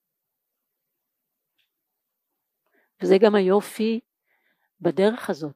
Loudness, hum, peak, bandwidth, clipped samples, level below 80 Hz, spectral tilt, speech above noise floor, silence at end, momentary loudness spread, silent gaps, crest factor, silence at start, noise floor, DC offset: -22 LUFS; none; -4 dBFS; 15.5 kHz; under 0.1%; -82 dBFS; -6.5 dB/octave; 61 dB; 0.05 s; 12 LU; none; 22 dB; 3 s; -82 dBFS; under 0.1%